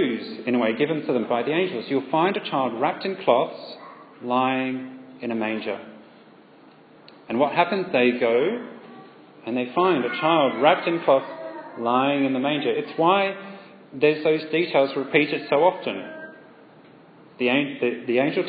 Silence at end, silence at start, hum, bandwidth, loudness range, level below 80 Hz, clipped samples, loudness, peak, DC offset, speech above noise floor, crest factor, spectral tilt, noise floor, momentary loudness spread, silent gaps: 0 s; 0 s; none; 5 kHz; 6 LU; -78 dBFS; under 0.1%; -23 LUFS; -2 dBFS; under 0.1%; 28 dB; 22 dB; -9.5 dB/octave; -50 dBFS; 16 LU; none